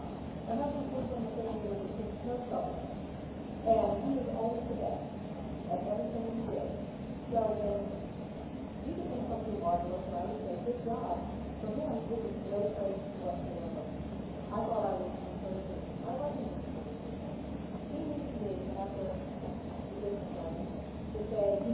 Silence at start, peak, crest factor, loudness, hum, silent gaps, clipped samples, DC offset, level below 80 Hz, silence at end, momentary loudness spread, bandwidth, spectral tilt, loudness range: 0 s; -16 dBFS; 20 dB; -37 LUFS; none; none; under 0.1%; under 0.1%; -50 dBFS; 0 s; 8 LU; 4 kHz; -8 dB/octave; 4 LU